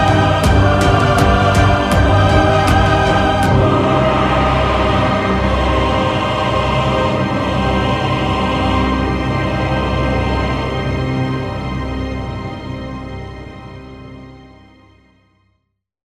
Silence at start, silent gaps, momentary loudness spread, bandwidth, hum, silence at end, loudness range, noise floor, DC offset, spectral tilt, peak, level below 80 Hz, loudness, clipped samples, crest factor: 0 s; none; 14 LU; 13.5 kHz; none; 1.65 s; 15 LU; -69 dBFS; under 0.1%; -6.5 dB/octave; 0 dBFS; -24 dBFS; -15 LUFS; under 0.1%; 14 dB